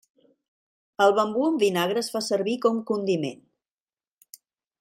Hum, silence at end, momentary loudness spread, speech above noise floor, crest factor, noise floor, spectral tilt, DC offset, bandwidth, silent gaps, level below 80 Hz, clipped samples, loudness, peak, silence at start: none; 1.45 s; 7 LU; over 67 dB; 20 dB; under -90 dBFS; -4.5 dB/octave; under 0.1%; 16 kHz; none; -74 dBFS; under 0.1%; -24 LUFS; -6 dBFS; 1 s